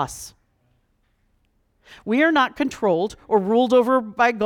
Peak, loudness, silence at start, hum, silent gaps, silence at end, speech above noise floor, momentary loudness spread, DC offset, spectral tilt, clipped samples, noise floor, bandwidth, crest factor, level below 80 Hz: -6 dBFS; -20 LUFS; 0 s; none; none; 0 s; 46 dB; 15 LU; under 0.1%; -5 dB/octave; under 0.1%; -66 dBFS; 17.5 kHz; 16 dB; -56 dBFS